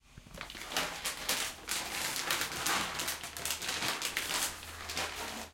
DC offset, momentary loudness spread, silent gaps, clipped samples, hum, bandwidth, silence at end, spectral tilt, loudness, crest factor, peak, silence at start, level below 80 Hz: under 0.1%; 8 LU; none; under 0.1%; none; 17 kHz; 0 s; -0.5 dB/octave; -34 LUFS; 26 dB; -12 dBFS; 0.05 s; -60 dBFS